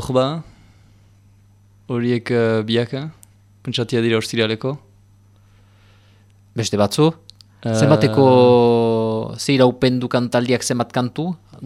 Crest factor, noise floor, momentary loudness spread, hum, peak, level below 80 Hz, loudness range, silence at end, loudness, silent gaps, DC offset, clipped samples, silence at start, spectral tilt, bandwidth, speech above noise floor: 18 dB; -51 dBFS; 14 LU; 50 Hz at -50 dBFS; -2 dBFS; -54 dBFS; 8 LU; 0 s; -18 LUFS; none; under 0.1%; under 0.1%; 0 s; -6 dB/octave; 14.5 kHz; 34 dB